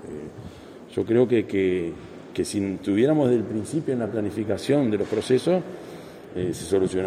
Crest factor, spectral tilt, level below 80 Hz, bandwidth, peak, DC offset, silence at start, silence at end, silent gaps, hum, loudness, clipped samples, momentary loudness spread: 16 dB; -6.5 dB/octave; -58 dBFS; 13.5 kHz; -8 dBFS; under 0.1%; 0 s; 0 s; none; none; -24 LUFS; under 0.1%; 19 LU